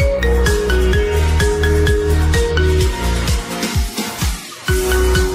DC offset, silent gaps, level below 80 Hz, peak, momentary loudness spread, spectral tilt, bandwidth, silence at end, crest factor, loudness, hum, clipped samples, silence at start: under 0.1%; none; -18 dBFS; -2 dBFS; 5 LU; -5 dB/octave; 16 kHz; 0 s; 12 dB; -16 LUFS; none; under 0.1%; 0 s